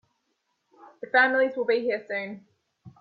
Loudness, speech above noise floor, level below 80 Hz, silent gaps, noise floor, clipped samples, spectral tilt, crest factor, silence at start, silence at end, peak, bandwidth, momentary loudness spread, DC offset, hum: -24 LUFS; 51 dB; -78 dBFS; none; -76 dBFS; under 0.1%; -6.5 dB/octave; 20 dB; 1 s; 0.1 s; -8 dBFS; 5 kHz; 20 LU; under 0.1%; none